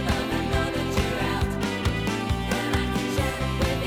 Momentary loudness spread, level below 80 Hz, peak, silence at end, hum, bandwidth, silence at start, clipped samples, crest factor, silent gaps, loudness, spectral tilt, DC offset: 1 LU; -34 dBFS; -10 dBFS; 0 s; none; 19 kHz; 0 s; under 0.1%; 14 dB; none; -26 LUFS; -5.5 dB/octave; under 0.1%